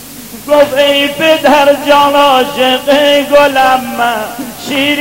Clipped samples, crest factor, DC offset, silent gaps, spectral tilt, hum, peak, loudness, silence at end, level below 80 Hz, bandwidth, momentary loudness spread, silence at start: 1%; 10 dB; 0.6%; none; -3 dB/octave; none; 0 dBFS; -9 LUFS; 0 s; -44 dBFS; 16.5 kHz; 10 LU; 0 s